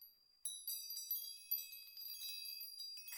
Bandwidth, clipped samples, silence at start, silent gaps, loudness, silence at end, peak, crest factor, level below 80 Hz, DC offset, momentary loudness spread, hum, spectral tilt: 17 kHz; under 0.1%; 0 s; none; -45 LUFS; 0 s; -28 dBFS; 20 dB; under -90 dBFS; under 0.1%; 7 LU; none; 6 dB/octave